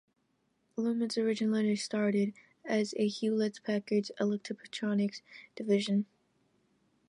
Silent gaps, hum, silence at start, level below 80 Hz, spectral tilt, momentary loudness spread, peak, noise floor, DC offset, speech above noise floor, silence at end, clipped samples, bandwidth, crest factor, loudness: none; none; 0.75 s; -80 dBFS; -5.5 dB/octave; 11 LU; -18 dBFS; -76 dBFS; under 0.1%; 44 dB; 1.05 s; under 0.1%; 11 kHz; 16 dB; -32 LUFS